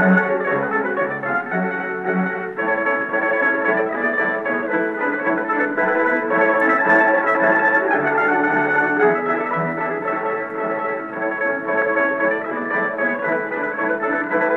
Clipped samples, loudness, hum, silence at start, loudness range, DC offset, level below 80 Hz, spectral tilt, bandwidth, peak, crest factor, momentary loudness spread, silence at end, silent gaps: under 0.1%; -19 LUFS; none; 0 s; 5 LU; under 0.1%; -74 dBFS; -8 dB/octave; 7.6 kHz; -4 dBFS; 16 dB; 7 LU; 0 s; none